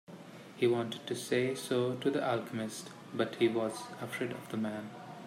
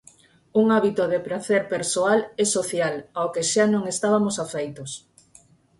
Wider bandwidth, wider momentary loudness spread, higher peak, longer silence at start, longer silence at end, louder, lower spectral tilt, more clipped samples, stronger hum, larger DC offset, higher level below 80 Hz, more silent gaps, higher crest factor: first, 16 kHz vs 11.5 kHz; about the same, 12 LU vs 10 LU; second, -16 dBFS vs -6 dBFS; second, 0.1 s vs 0.55 s; second, 0 s vs 0.8 s; second, -35 LUFS vs -23 LUFS; about the same, -5 dB/octave vs -4 dB/octave; neither; neither; neither; second, -80 dBFS vs -66 dBFS; neither; about the same, 18 dB vs 18 dB